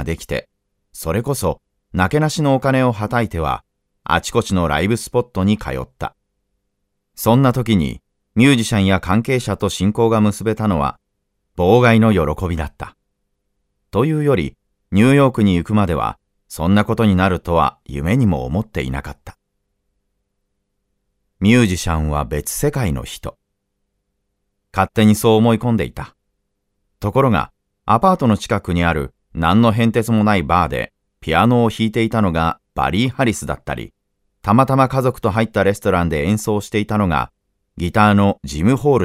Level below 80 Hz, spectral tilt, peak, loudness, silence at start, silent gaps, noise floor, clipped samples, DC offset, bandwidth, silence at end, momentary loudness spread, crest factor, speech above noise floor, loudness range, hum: -36 dBFS; -6.5 dB/octave; 0 dBFS; -17 LUFS; 0 s; none; -72 dBFS; under 0.1%; under 0.1%; 16 kHz; 0 s; 13 LU; 18 dB; 56 dB; 4 LU; none